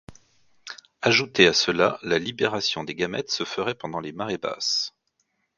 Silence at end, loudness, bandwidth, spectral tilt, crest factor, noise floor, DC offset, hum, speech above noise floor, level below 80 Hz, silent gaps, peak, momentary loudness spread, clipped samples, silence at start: 0.7 s; -23 LUFS; 7.6 kHz; -3 dB/octave; 26 dB; -73 dBFS; under 0.1%; none; 49 dB; -60 dBFS; none; 0 dBFS; 15 LU; under 0.1%; 0.1 s